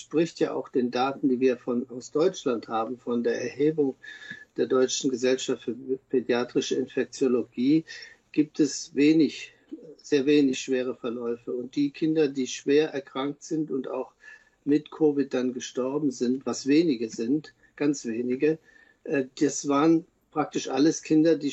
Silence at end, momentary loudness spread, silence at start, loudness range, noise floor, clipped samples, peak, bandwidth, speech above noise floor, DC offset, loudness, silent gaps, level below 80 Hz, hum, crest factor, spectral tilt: 0 s; 10 LU; 0 s; 2 LU; -52 dBFS; under 0.1%; -10 dBFS; 8.2 kHz; 26 dB; under 0.1%; -26 LUFS; none; -74 dBFS; none; 16 dB; -5 dB/octave